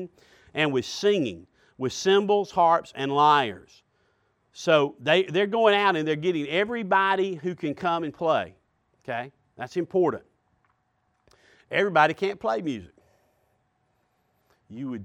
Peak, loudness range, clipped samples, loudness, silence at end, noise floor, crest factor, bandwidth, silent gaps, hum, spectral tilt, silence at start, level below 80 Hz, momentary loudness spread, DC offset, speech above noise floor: -6 dBFS; 6 LU; under 0.1%; -24 LUFS; 0 s; -72 dBFS; 20 dB; 10.5 kHz; none; none; -5 dB/octave; 0 s; -68 dBFS; 16 LU; under 0.1%; 47 dB